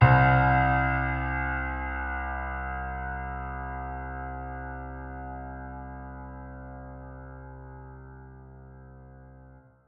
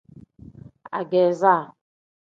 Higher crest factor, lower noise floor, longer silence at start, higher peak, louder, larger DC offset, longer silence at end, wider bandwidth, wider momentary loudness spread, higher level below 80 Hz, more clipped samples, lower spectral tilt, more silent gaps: about the same, 24 dB vs 22 dB; first, -53 dBFS vs -46 dBFS; second, 0 s vs 0.9 s; second, -6 dBFS vs -2 dBFS; second, -29 LUFS vs -21 LUFS; neither; second, 0.3 s vs 0.6 s; second, 5 kHz vs 7.6 kHz; first, 26 LU vs 15 LU; first, -38 dBFS vs -62 dBFS; neither; first, -10.5 dB/octave vs -7 dB/octave; neither